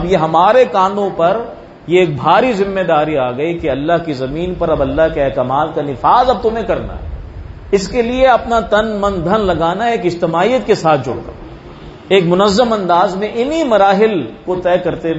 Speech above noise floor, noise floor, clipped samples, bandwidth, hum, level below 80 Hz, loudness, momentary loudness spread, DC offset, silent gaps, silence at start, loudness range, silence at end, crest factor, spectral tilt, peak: 20 dB; -33 dBFS; under 0.1%; 8 kHz; none; -34 dBFS; -14 LUFS; 13 LU; under 0.1%; none; 0 s; 2 LU; 0 s; 14 dB; -6 dB/octave; 0 dBFS